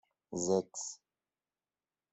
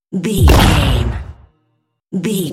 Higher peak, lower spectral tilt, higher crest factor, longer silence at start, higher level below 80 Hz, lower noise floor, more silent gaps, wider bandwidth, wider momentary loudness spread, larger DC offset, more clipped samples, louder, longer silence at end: second, -18 dBFS vs 0 dBFS; about the same, -5 dB/octave vs -5.5 dB/octave; first, 22 dB vs 14 dB; first, 0.3 s vs 0.1 s; second, -76 dBFS vs -20 dBFS; first, under -90 dBFS vs -65 dBFS; neither; second, 8.4 kHz vs 17 kHz; second, 12 LU vs 17 LU; neither; neither; second, -36 LUFS vs -14 LUFS; first, 1.15 s vs 0 s